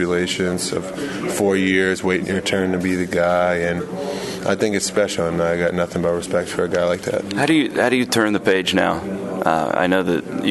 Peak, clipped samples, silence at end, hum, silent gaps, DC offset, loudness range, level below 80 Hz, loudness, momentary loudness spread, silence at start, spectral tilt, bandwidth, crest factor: 0 dBFS; under 0.1%; 0 s; none; none; under 0.1%; 2 LU; -50 dBFS; -19 LUFS; 7 LU; 0 s; -4.5 dB/octave; 12.5 kHz; 18 dB